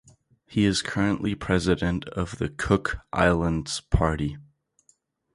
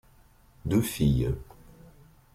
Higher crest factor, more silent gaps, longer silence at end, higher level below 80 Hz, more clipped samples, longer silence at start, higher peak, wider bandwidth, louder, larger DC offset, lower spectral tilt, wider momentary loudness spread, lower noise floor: first, 22 dB vs 16 dB; neither; about the same, 0.95 s vs 0.9 s; about the same, -38 dBFS vs -42 dBFS; neither; second, 0.5 s vs 0.65 s; first, -4 dBFS vs -14 dBFS; second, 11.5 kHz vs 16 kHz; first, -25 LUFS vs -28 LUFS; neither; about the same, -5.5 dB/octave vs -6.5 dB/octave; second, 8 LU vs 12 LU; first, -66 dBFS vs -58 dBFS